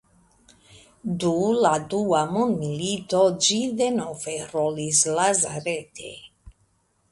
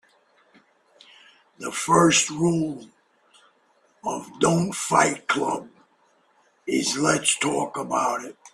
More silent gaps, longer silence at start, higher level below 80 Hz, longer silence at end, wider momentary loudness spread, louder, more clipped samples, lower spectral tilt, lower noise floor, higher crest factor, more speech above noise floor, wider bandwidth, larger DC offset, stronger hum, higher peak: neither; second, 0.7 s vs 1.6 s; about the same, -60 dBFS vs -62 dBFS; first, 0.6 s vs 0.05 s; about the same, 12 LU vs 14 LU; about the same, -23 LUFS vs -23 LUFS; neither; about the same, -3.5 dB/octave vs -3.5 dB/octave; about the same, -66 dBFS vs -63 dBFS; about the same, 18 dB vs 22 dB; about the same, 43 dB vs 40 dB; second, 11.5 kHz vs 14.5 kHz; neither; neither; about the same, -6 dBFS vs -4 dBFS